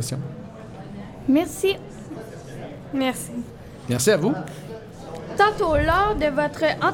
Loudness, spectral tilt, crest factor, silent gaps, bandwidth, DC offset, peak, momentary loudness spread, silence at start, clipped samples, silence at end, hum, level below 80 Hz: -22 LUFS; -4.5 dB/octave; 20 dB; none; 17 kHz; under 0.1%; -4 dBFS; 19 LU; 0 s; under 0.1%; 0 s; none; -40 dBFS